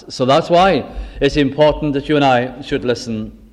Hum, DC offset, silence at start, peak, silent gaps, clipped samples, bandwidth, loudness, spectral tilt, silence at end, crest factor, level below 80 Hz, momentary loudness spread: none; under 0.1%; 0.05 s; -2 dBFS; none; under 0.1%; 11 kHz; -15 LUFS; -6 dB/octave; 0.2 s; 14 dB; -34 dBFS; 9 LU